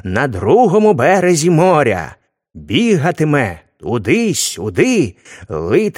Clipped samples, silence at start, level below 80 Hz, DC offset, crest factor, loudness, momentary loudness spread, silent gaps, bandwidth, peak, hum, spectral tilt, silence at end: under 0.1%; 0.05 s; -46 dBFS; under 0.1%; 14 dB; -14 LUFS; 11 LU; none; 16.5 kHz; 0 dBFS; none; -5 dB/octave; 0.05 s